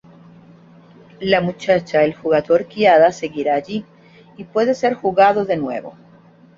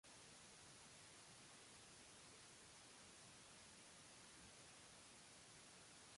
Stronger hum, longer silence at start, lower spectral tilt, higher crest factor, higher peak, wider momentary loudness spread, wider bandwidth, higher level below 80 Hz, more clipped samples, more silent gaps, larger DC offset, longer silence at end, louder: neither; first, 1.2 s vs 0.05 s; first, -6 dB/octave vs -1.5 dB/octave; about the same, 16 dB vs 14 dB; first, -2 dBFS vs -50 dBFS; first, 14 LU vs 0 LU; second, 7.6 kHz vs 11.5 kHz; first, -58 dBFS vs -84 dBFS; neither; neither; neither; first, 0.65 s vs 0 s; first, -17 LUFS vs -62 LUFS